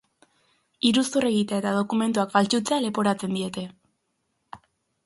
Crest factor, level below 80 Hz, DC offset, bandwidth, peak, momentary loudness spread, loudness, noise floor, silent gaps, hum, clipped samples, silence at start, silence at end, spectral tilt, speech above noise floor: 20 dB; -66 dBFS; under 0.1%; 11.5 kHz; -4 dBFS; 8 LU; -24 LUFS; -75 dBFS; none; none; under 0.1%; 0.85 s; 0.5 s; -4.5 dB/octave; 52 dB